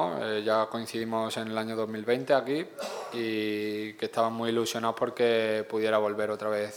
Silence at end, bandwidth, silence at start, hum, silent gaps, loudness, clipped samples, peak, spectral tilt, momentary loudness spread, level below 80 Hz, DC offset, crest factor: 0 s; 18.5 kHz; 0 s; none; none; -29 LUFS; under 0.1%; -10 dBFS; -4.5 dB/octave; 7 LU; -78 dBFS; under 0.1%; 18 dB